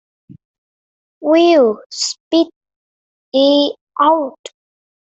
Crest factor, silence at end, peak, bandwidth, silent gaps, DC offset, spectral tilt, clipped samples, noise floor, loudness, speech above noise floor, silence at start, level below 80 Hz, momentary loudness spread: 16 dB; 0.85 s; -2 dBFS; 8.4 kHz; 1.86-1.90 s, 2.20-2.31 s, 2.56-2.61 s, 2.76-3.32 s, 3.81-3.87 s; under 0.1%; -3 dB/octave; under 0.1%; under -90 dBFS; -15 LUFS; over 77 dB; 1.2 s; -66 dBFS; 10 LU